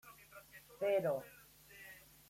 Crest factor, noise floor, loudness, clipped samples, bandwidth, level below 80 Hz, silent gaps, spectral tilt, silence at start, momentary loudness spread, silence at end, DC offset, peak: 18 dB; -60 dBFS; -38 LUFS; under 0.1%; 16.5 kHz; -76 dBFS; none; -5.5 dB/octave; 0.05 s; 22 LU; 0.3 s; under 0.1%; -24 dBFS